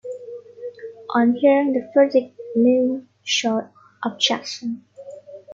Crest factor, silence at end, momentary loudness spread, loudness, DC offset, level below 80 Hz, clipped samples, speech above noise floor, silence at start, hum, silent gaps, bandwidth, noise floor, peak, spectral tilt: 16 dB; 0 s; 20 LU; -20 LUFS; under 0.1%; -70 dBFS; under 0.1%; 20 dB; 0.05 s; 50 Hz at -55 dBFS; none; 7.6 kHz; -39 dBFS; -4 dBFS; -3.5 dB/octave